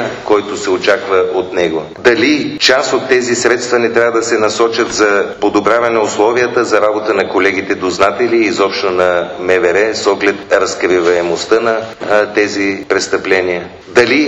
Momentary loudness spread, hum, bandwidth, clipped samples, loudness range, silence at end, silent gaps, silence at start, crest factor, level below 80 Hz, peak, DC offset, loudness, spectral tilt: 4 LU; none; 9.4 kHz; under 0.1%; 1 LU; 0 s; none; 0 s; 12 dB; -50 dBFS; 0 dBFS; under 0.1%; -12 LUFS; -3.5 dB/octave